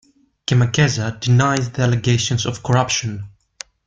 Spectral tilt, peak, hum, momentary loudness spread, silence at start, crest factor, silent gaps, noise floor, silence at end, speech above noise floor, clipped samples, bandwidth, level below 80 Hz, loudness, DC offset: -5 dB/octave; -2 dBFS; none; 16 LU; 0.5 s; 16 dB; none; -41 dBFS; 0.6 s; 24 dB; under 0.1%; 7.8 kHz; -46 dBFS; -18 LUFS; under 0.1%